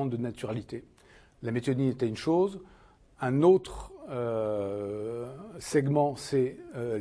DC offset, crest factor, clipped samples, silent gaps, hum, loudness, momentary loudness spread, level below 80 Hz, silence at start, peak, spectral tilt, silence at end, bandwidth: under 0.1%; 20 dB; under 0.1%; none; none; -29 LUFS; 17 LU; -56 dBFS; 0 s; -10 dBFS; -7 dB/octave; 0 s; 11 kHz